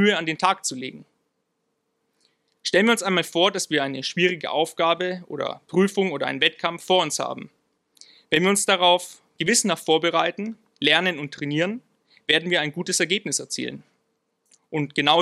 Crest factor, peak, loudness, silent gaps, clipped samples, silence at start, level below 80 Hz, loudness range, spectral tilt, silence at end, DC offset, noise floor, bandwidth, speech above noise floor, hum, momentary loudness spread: 22 dB; -2 dBFS; -22 LUFS; none; under 0.1%; 0 s; -72 dBFS; 3 LU; -3 dB/octave; 0 s; under 0.1%; -75 dBFS; 15 kHz; 52 dB; none; 11 LU